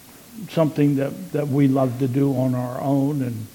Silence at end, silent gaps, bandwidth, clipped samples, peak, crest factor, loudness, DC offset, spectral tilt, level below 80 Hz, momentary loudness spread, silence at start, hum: 0.05 s; none; 17.5 kHz; under 0.1%; -6 dBFS; 16 dB; -21 LUFS; under 0.1%; -8.5 dB/octave; -60 dBFS; 8 LU; 0.1 s; none